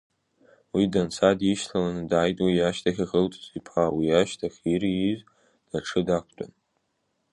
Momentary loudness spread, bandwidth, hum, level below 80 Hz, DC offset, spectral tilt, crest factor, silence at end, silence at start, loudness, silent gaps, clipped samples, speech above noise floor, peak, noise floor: 11 LU; 11.5 kHz; none; -54 dBFS; under 0.1%; -6 dB/octave; 20 dB; 0.85 s; 0.75 s; -25 LUFS; none; under 0.1%; 50 dB; -6 dBFS; -75 dBFS